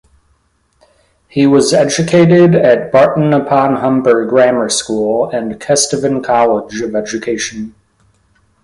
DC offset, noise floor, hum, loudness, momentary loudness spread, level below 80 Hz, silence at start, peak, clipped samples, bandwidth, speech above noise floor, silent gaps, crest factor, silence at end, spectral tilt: under 0.1%; -58 dBFS; none; -12 LUFS; 10 LU; -50 dBFS; 1.35 s; 0 dBFS; under 0.1%; 11.5 kHz; 46 dB; none; 12 dB; 0.95 s; -5 dB/octave